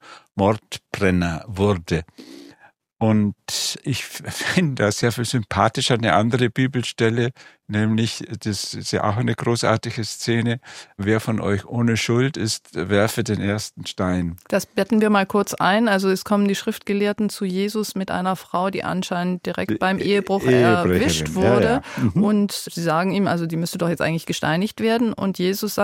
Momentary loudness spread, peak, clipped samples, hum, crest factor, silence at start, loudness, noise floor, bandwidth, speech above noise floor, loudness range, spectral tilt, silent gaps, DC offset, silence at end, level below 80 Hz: 8 LU; -2 dBFS; under 0.1%; none; 20 dB; 0.05 s; -21 LUFS; -53 dBFS; 16.5 kHz; 33 dB; 4 LU; -5.5 dB/octave; none; under 0.1%; 0 s; -50 dBFS